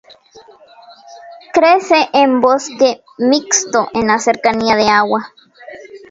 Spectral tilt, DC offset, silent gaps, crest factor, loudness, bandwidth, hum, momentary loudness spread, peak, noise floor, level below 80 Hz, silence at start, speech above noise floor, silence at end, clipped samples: -2.5 dB/octave; under 0.1%; none; 14 dB; -13 LUFS; 7.8 kHz; none; 9 LU; 0 dBFS; -39 dBFS; -54 dBFS; 0.35 s; 26 dB; 0.15 s; under 0.1%